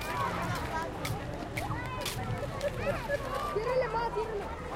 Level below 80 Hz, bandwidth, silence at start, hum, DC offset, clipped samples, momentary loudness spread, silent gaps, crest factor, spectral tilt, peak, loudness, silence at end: -46 dBFS; 16.5 kHz; 0 s; none; under 0.1%; under 0.1%; 6 LU; none; 14 dB; -5 dB/octave; -20 dBFS; -34 LUFS; 0 s